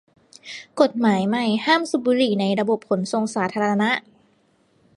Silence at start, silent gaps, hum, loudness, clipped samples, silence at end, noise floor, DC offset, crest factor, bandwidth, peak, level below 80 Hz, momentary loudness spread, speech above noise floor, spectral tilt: 0.45 s; none; none; -21 LUFS; under 0.1%; 0.95 s; -62 dBFS; under 0.1%; 20 dB; 11.5 kHz; -2 dBFS; -68 dBFS; 6 LU; 41 dB; -5.5 dB/octave